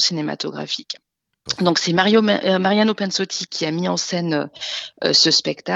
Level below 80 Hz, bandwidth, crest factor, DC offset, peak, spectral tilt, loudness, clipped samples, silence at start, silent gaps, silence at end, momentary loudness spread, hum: -66 dBFS; 8 kHz; 18 dB; under 0.1%; 0 dBFS; -3.5 dB/octave; -19 LUFS; under 0.1%; 0 s; none; 0 s; 12 LU; none